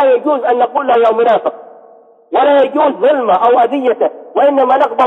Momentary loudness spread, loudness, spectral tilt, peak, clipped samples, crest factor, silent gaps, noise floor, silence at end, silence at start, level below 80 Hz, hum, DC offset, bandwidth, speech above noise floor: 5 LU; -12 LUFS; -6 dB/octave; -2 dBFS; under 0.1%; 10 dB; none; -42 dBFS; 0 s; 0 s; -64 dBFS; none; under 0.1%; 4.1 kHz; 31 dB